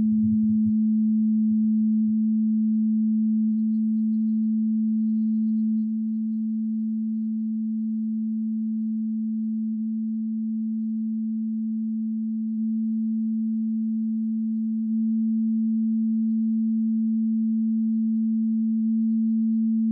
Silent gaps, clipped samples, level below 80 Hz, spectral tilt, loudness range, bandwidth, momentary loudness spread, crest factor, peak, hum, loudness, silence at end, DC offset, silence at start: none; under 0.1%; -76 dBFS; -14.5 dB/octave; 5 LU; 0.3 kHz; 6 LU; 8 dB; -16 dBFS; none; -25 LUFS; 0 s; under 0.1%; 0 s